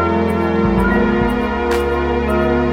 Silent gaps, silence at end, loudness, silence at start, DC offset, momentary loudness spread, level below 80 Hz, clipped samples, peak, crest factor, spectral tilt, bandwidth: none; 0 s; -16 LUFS; 0 s; 0.5%; 3 LU; -26 dBFS; under 0.1%; -2 dBFS; 14 dB; -7.5 dB/octave; 16.5 kHz